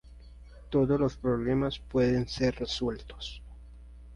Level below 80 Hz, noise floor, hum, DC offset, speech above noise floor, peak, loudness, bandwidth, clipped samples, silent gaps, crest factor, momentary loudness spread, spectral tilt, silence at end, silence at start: -46 dBFS; -49 dBFS; none; under 0.1%; 21 dB; -14 dBFS; -29 LUFS; 11 kHz; under 0.1%; none; 16 dB; 14 LU; -6.5 dB/octave; 0 s; 0.05 s